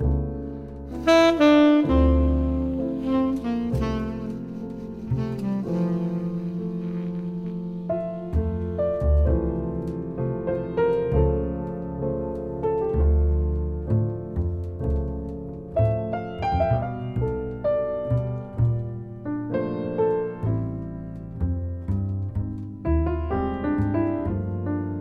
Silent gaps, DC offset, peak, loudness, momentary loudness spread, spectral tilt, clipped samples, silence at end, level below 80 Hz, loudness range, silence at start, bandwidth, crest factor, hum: none; under 0.1%; -4 dBFS; -25 LUFS; 11 LU; -8.5 dB/octave; under 0.1%; 0 s; -30 dBFS; 7 LU; 0 s; 7.2 kHz; 18 dB; none